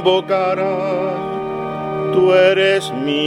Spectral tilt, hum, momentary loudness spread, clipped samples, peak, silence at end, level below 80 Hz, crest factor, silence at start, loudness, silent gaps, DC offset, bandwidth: -5.5 dB/octave; none; 11 LU; under 0.1%; -2 dBFS; 0 s; -54 dBFS; 14 dB; 0 s; -17 LUFS; none; under 0.1%; 12 kHz